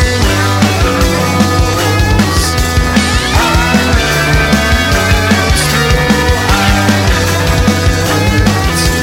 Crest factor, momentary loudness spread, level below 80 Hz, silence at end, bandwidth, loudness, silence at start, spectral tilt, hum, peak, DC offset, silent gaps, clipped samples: 10 dB; 2 LU; -16 dBFS; 0 s; 17 kHz; -10 LUFS; 0 s; -4.5 dB/octave; none; 0 dBFS; under 0.1%; none; under 0.1%